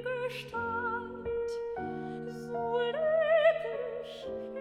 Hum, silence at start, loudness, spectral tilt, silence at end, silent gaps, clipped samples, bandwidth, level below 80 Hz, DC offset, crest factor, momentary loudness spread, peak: none; 0 s; -32 LUFS; -5.5 dB/octave; 0 s; none; under 0.1%; 12.5 kHz; -62 dBFS; under 0.1%; 18 dB; 14 LU; -14 dBFS